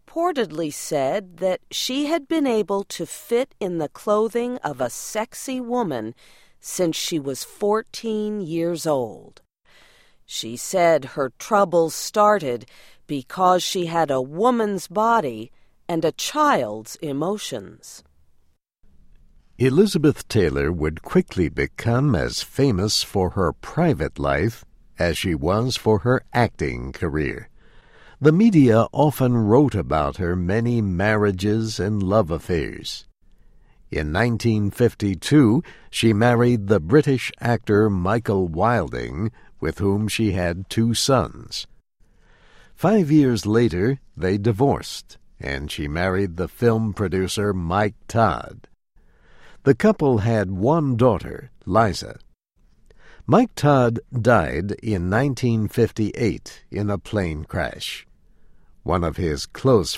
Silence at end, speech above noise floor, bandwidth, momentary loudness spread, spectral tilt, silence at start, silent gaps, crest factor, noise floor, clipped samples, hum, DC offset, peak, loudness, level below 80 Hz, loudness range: 0 s; 38 dB; 16 kHz; 12 LU; -6 dB/octave; 0.15 s; none; 20 dB; -59 dBFS; under 0.1%; none; under 0.1%; -2 dBFS; -21 LUFS; -42 dBFS; 6 LU